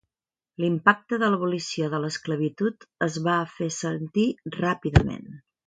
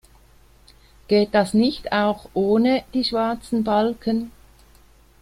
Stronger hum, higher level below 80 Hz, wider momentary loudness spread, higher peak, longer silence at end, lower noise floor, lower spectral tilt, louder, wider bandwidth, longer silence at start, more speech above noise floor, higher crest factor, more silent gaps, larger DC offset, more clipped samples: neither; first, -42 dBFS vs -50 dBFS; about the same, 8 LU vs 7 LU; about the same, -2 dBFS vs -4 dBFS; second, 0.3 s vs 0.9 s; first, under -90 dBFS vs -52 dBFS; about the same, -5.5 dB/octave vs -6 dB/octave; second, -25 LUFS vs -21 LUFS; second, 9.4 kHz vs 14 kHz; second, 0.6 s vs 1.1 s; first, over 65 dB vs 32 dB; first, 24 dB vs 18 dB; neither; neither; neither